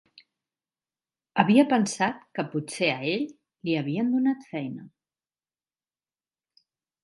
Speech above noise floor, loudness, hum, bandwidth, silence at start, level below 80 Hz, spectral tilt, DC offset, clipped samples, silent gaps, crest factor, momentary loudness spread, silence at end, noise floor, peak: over 65 dB; -26 LUFS; none; 11.5 kHz; 1.35 s; -76 dBFS; -5 dB/octave; under 0.1%; under 0.1%; none; 26 dB; 15 LU; 2.15 s; under -90 dBFS; -2 dBFS